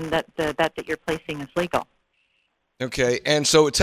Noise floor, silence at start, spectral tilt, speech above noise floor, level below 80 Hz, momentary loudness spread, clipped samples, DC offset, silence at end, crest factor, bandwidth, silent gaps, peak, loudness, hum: -70 dBFS; 0 s; -3.5 dB/octave; 48 dB; -50 dBFS; 12 LU; under 0.1%; under 0.1%; 0 s; 22 dB; 15.5 kHz; none; -2 dBFS; -23 LUFS; none